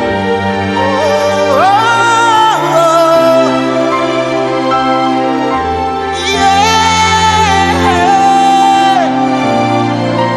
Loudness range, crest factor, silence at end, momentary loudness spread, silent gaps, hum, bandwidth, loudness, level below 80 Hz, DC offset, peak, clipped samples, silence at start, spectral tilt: 3 LU; 10 dB; 0 s; 5 LU; none; none; 13 kHz; -10 LUFS; -38 dBFS; under 0.1%; 0 dBFS; 0.1%; 0 s; -4 dB/octave